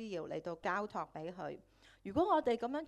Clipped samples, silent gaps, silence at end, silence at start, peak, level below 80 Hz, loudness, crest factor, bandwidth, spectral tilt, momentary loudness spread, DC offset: under 0.1%; none; 0 s; 0 s; -20 dBFS; -68 dBFS; -38 LUFS; 18 dB; 12 kHz; -6 dB/octave; 15 LU; under 0.1%